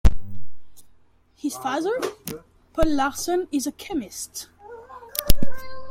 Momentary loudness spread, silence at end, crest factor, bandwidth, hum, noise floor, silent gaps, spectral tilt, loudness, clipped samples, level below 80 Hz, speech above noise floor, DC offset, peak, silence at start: 18 LU; 0 s; 20 dB; 16.5 kHz; none; -57 dBFS; none; -5 dB/octave; -27 LUFS; under 0.1%; -30 dBFS; 32 dB; under 0.1%; 0 dBFS; 0.05 s